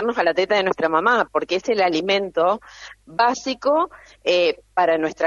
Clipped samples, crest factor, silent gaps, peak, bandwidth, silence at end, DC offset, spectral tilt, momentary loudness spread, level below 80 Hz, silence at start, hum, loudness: under 0.1%; 16 dB; none; -4 dBFS; 7.6 kHz; 0 s; under 0.1%; -4 dB/octave; 9 LU; -58 dBFS; 0 s; none; -20 LUFS